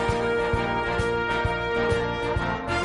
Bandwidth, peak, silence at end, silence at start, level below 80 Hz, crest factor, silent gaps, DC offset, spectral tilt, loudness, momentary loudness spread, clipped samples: 11.5 kHz; -12 dBFS; 0 s; 0 s; -38 dBFS; 12 dB; none; under 0.1%; -6 dB/octave; -25 LUFS; 2 LU; under 0.1%